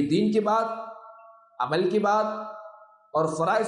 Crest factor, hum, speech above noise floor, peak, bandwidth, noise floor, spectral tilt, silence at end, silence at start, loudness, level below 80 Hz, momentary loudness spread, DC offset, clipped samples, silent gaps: 14 dB; none; 27 dB; -12 dBFS; 11.5 kHz; -51 dBFS; -6 dB/octave; 0 s; 0 s; -25 LUFS; -70 dBFS; 17 LU; under 0.1%; under 0.1%; none